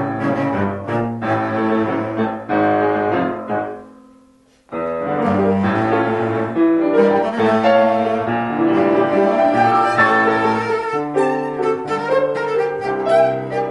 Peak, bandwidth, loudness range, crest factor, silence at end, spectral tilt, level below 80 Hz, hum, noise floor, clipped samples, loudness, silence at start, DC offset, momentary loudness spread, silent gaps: -2 dBFS; 10.5 kHz; 5 LU; 16 dB; 0 s; -7.5 dB/octave; -54 dBFS; none; -52 dBFS; under 0.1%; -17 LUFS; 0 s; under 0.1%; 8 LU; none